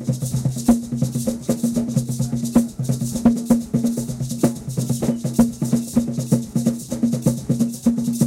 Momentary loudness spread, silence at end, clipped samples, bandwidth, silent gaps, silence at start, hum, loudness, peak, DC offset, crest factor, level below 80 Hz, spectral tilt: 5 LU; 0 s; under 0.1%; 16 kHz; none; 0 s; none; -21 LUFS; -4 dBFS; under 0.1%; 18 dB; -44 dBFS; -7 dB/octave